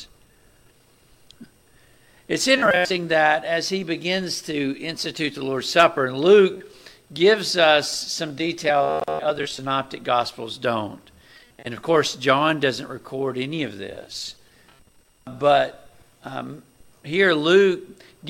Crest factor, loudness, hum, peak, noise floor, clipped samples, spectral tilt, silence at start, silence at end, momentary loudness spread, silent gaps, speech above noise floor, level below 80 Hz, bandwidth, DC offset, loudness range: 20 dB; -21 LUFS; none; -2 dBFS; -56 dBFS; under 0.1%; -4 dB/octave; 0 s; 0 s; 17 LU; none; 35 dB; -60 dBFS; 16 kHz; under 0.1%; 7 LU